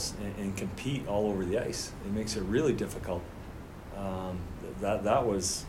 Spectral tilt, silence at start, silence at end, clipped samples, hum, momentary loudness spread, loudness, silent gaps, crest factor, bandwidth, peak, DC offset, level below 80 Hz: -5 dB/octave; 0 s; 0 s; under 0.1%; none; 13 LU; -32 LUFS; none; 18 dB; 16 kHz; -14 dBFS; under 0.1%; -48 dBFS